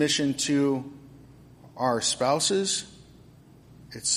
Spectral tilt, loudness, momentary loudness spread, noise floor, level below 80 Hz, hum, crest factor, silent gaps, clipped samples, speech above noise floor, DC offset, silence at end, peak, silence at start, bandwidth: -3 dB/octave; -25 LUFS; 16 LU; -52 dBFS; -62 dBFS; none; 16 dB; none; under 0.1%; 27 dB; under 0.1%; 0 s; -12 dBFS; 0 s; 15 kHz